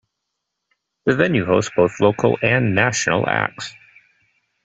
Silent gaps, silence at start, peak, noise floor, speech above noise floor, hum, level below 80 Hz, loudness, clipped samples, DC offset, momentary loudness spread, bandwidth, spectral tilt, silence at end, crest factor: none; 1.05 s; -2 dBFS; -78 dBFS; 60 dB; none; -54 dBFS; -18 LUFS; under 0.1%; under 0.1%; 8 LU; 8.2 kHz; -5 dB/octave; 0.95 s; 18 dB